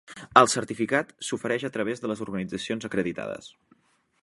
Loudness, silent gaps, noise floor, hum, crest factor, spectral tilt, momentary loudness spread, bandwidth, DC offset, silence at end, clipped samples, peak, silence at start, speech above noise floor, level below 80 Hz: -26 LUFS; none; -65 dBFS; none; 26 dB; -4 dB/octave; 13 LU; 11.5 kHz; under 0.1%; 0.75 s; under 0.1%; 0 dBFS; 0.1 s; 38 dB; -64 dBFS